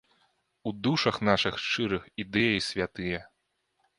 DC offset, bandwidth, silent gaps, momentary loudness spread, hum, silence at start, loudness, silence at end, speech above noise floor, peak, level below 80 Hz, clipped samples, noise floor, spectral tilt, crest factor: under 0.1%; 11.5 kHz; none; 10 LU; none; 0.65 s; -28 LUFS; 0.75 s; 48 dB; -6 dBFS; -56 dBFS; under 0.1%; -77 dBFS; -5 dB/octave; 24 dB